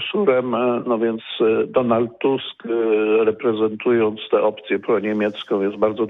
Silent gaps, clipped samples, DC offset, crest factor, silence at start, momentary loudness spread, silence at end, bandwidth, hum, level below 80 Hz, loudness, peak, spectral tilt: none; under 0.1%; under 0.1%; 14 dB; 0 s; 5 LU; 0 s; 4 kHz; none; -64 dBFS; -20 LUFS; -6 dBFS; -8.5 dB/octave